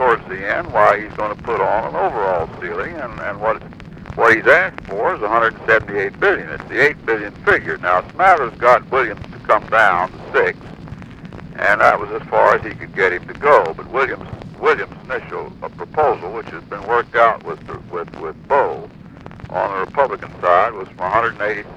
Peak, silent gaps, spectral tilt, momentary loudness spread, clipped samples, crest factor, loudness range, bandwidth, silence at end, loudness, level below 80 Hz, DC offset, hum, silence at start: 0 dBFS; none; -6 dB/octave; 16 LU; under 0.1%; 18 dB; 5 LU; 11.5 kHz; 0 s; -17 LUFS; -46 dBFS; under 0.1%; none; 0 s